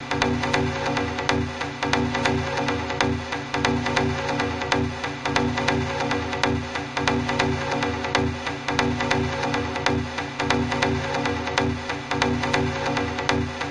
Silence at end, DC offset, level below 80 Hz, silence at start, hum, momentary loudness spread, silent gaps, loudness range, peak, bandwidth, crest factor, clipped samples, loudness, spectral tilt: 0 s; under 0.1%; -44 dBFS; 0 s; none; 4 LU; none; 1 LU; -4 dBFS; 11 kHz; 20 dB; under 0.1%; -24 LUFS; -5 dB/octave